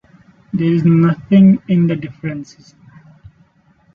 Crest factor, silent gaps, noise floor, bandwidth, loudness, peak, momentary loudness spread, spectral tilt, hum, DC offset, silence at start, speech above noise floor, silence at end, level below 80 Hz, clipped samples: 14 dB; none; -54 dBFS; 6.8 kHz; -14 LUFS; -2 dBFS; 16 LU; -9.5 dB/octave; none; under 0.1%; 0.55 s; 40 dB; 1.5 s; -52 dBFS; under 0.1%